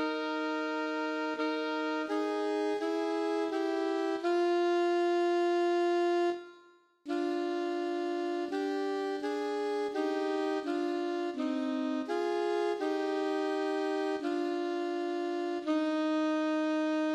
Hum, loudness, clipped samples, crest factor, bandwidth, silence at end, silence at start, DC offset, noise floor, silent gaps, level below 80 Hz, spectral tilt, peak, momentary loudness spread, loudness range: none; -32 LUFS; under 0.1%; 10 dB; 10 kHz; 0 s; 0 s; under 0.1%; -61 dBFS; none; -84 dBFS; -3 dB/octave; -20 dBFS; 5 LU; 3 LU